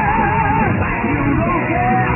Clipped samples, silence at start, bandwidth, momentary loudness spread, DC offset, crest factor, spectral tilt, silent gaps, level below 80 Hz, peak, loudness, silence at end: under 0.1%; 0 s; 3 kHz; 2 LU; under 0.1%; 10 dB; -11 dB/octave; none; -28 dBFS; -4 dBFS; -16 LUFS; 0 s